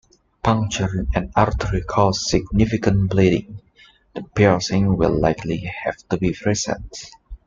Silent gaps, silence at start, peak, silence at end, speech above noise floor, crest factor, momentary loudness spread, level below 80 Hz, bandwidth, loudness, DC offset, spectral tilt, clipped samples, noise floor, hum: none; 0.45 s; -2 dBFS; 0.1 s; 33 dB; 18 dB; 12 LU; -34 dBFS; 7.6 kHz; -20 LUFS; under 0.1%; -6 dB/octave; under 0.1%; -53 dBFS; none